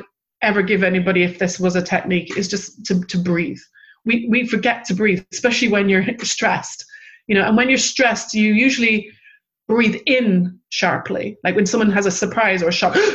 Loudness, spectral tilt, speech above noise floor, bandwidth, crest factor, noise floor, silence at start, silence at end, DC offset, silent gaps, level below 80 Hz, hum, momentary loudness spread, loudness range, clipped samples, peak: -17 LUFS; -4.5 dB/octave; 35 dB; 8.4 kHz; 16 dB; -53 dBFS; 0 s; 0 s; under 0.1%; none; -54 dBFS; none; 8 LU; 3 LU; under 0.1%; -2 dBFS